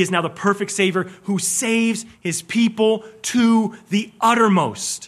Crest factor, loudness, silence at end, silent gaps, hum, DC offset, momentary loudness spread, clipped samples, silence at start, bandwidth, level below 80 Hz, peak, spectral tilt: 16 dB; -19 LUFS; 0 s; none; none; under 0.1%; 8 LU; under 0.1%; 0 s; 14.5 kHz; -66 dBFS; -2 dBFS; -4 dB/octave